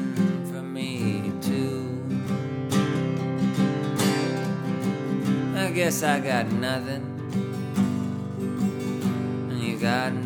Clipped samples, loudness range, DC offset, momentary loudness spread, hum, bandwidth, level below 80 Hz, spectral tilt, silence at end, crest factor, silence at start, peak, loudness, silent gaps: under 0.1%; 3 LU; under 0.1%; 7 LU; none; 18 kHz; -66 dBFS; -6 dB/octave; 0 s; 20 dB; 0 s; -6 dBFS; -26 LUFS; none